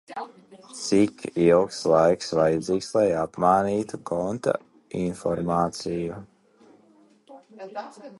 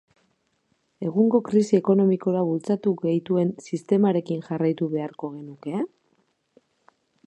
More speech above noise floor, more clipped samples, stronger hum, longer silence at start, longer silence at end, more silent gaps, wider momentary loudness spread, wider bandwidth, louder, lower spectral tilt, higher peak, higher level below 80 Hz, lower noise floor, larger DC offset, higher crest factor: second, 34 dB vs 48 dB; neither; neither; second, 0.1 s vs 1 s; second, 0.05 s vs 1.4 s; neither; first, 18 LU vs 13 LU; first, 11.5 kHz vs 8.8 kHz; about the same, -24 LUFS vs -23 LUFS; second, -6 dB/octave vs -8.5 dB/octave; about the same, -6 dBFS vs -6 dBFS; first, -56 dBFS vs -72 dBFS; second, -58 dBFS vs -70 dBFS; neither; about the same, 20 dB vs 18 dB